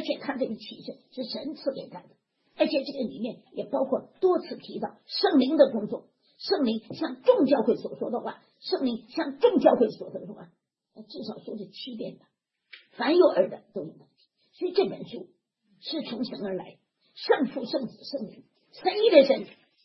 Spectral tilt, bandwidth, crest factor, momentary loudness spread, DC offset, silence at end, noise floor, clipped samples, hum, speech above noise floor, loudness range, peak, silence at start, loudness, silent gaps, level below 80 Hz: -7.5 dB/octave; 6 kHz; 24 dB; 19 LU; under 0.1%; 0.35 s; -65 dBFS; under 0.1%; none; 39 dB; 8 LU; -4 dBFS; 0 s; -26 LUFS; none; -78 dBFS